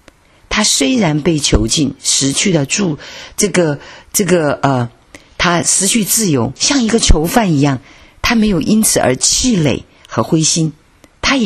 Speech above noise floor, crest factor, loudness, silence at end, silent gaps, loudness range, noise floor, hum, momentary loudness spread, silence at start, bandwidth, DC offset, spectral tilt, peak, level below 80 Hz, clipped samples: 33 dB; 14 dB; -13 LUFS; 0 s; none; 2 LU; -46 dBFS; none; 8 LU; 0.5 s; 14 kHz; under 0.1%; -3.5 dB/octave; 0 dBFS; -26 dBFS; under 0.1%